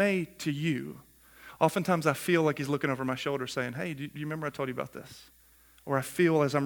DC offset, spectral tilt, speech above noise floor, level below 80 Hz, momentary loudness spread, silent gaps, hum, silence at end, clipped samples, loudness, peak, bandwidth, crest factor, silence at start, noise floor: under 0.1%; -6 dB/octave; 23 dB; -66 dBFS; 18 LU; none; none; 0 s; under 0.1%; -30 LUFS; -10 dBFS; 19.5 kHz; 22 dB; 0 s; -53 dBFS